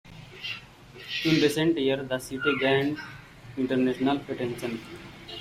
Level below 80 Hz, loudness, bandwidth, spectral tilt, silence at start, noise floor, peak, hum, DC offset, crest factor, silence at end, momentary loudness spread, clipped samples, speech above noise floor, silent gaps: -58 dBFS; -27 LUFS; 16 kHz; -5.5 dB/octave; 0.05 s; -47 dBFS; -10 dBFS; none; under 0.1%; 18 dB; 0 s; 20 LU; under 0.1%; 21 dB; none